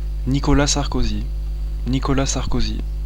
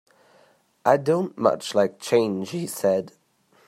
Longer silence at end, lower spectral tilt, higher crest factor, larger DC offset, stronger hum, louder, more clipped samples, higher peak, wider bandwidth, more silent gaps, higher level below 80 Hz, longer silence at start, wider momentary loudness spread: second, 0 s vs 0.6 s; about the same, -4.5 dB/octave vs -5.5 dB/octave; about the same, 16 dB vs 20 dB; first, 0.8% vs under 0.1%; first, 50 Hz at -25 dBFS vs none; about the same, -21 LUFS vs -23 LUFS; neither; about the same, -4 dBFS vs -4 dBFS; second, 11 kHz vs 16 kHz; neither; first, -22 dBFS vs -72 dBFS; second, 0 s vs 0.85 s; first, 10 LU vs 7 LU